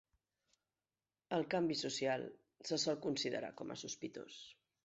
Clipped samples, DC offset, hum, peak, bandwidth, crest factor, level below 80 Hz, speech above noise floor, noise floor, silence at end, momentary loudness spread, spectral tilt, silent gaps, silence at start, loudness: under 0.1%; under 0.1%; none; -24 dBFS; 8 kHz; 18 dB; -82 dBFS; over 50 dB; under -90 dBFS; 0.35 s; 14 LU; -3.5 dB/octave; none; 1.3 s; -40 LUFS